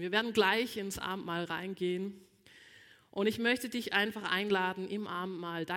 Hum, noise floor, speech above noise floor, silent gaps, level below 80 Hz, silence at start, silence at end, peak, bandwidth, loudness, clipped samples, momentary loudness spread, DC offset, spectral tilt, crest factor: none; -59 dBFS; 26 dB; none; -68 dBFS; 0 s; 0 s; -14 dBFS; 17 kHz; -33 LUFS; under 0.1%; 10 LU; under 0.1%; -4 dB/octave; 22 dB